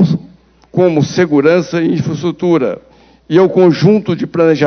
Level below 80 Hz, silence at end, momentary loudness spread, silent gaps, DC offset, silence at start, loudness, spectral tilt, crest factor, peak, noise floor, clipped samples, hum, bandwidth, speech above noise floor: -50 dBFS; 0 s; 9 LU; none; under 0.1%; 0 s; -12 LUFS; -7.5 dB/octave; 12 dB; 0 dBFS; -42 dBFS; under 0.1%; none; 6.6 kHz; 31 dB